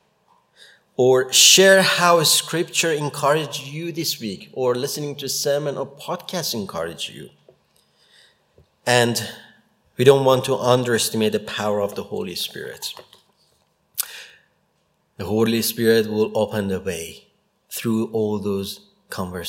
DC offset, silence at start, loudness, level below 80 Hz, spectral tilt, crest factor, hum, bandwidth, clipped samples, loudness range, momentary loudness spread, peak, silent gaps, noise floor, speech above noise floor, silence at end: under 0.1%; 1 s; -19 LUFS; -64 dBFS; -3 dB/octave; 22 dB; none; 16.5 kHz; under 0.1%; 13 LU; 17 LU; 0 dBFS; none; -67 dBFS; 47 dB; 0 s